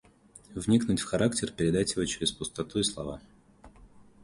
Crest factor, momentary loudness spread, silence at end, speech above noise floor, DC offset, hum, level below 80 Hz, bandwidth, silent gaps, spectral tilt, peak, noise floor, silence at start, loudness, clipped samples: 20 dB; 13 LU; 0.2 s; 27 dB; under 0.1%; none; -52 dBFS; 11.5 kHz; none; -4.5 dB/octave; -12 dBFS; -56 dBFS; 0.5 s; -29 LUFS; under 0.1%